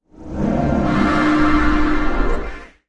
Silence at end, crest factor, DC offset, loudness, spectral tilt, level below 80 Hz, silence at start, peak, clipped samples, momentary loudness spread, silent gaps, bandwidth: 0.25 s; 14 dB; under 0.1%; -18 LUFS; -7 dB/octave; -24 dBFS; 0.2 s; -2 dBFS; under 0.1%; 11 LU; none; 8.8 kHz